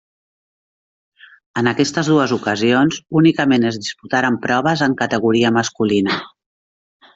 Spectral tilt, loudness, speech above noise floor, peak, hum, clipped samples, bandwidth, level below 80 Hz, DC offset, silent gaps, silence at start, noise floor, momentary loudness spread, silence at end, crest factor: -5 dB/octave; -17 LUFS; over 74 dB; -2 dBFS; none; under 0.1%; 8 kHz; -58 dBFS; under 0.1%; none; 1.55 s; under -90 dBFS; 6 LU; 0.9 s; 16 dB